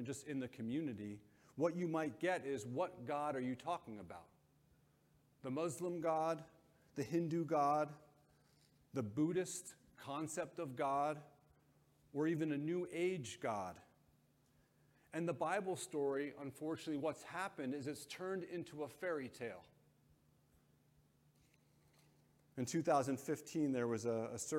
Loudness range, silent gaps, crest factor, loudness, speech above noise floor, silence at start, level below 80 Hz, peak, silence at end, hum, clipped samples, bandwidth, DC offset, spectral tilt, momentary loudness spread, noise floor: 6 LU; none; 20 dB; -42 LUFS; 33 dB; 0 s; -82 dBFS; -24 dBFS; 0 s; none; under 0.1%; 16.5 kHz; under 0.1%; -5.5 dB/octave; 11 LU; -74 dBFS